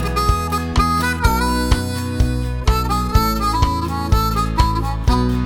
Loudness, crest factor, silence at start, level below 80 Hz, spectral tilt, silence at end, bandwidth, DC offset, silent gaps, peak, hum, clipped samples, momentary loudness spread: -18 LUFS; 16 dB; 0 s; -22 dBFS; -5.5 dB/octave; 0 s; 17.5 kHz; under 0.1%; none; 0 dBFS; none; under 0.1%; 3 LU